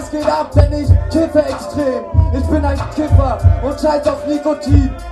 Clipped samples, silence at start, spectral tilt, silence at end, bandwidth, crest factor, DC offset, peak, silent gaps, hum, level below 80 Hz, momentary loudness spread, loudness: under 0.1%; 0 s; -8 dB/octave; 0 s; 11.5 kHz; 14 dB; under 0.1%; 0 dBFS; none; none; -20 dBFS; 5 LU; -15 LUFS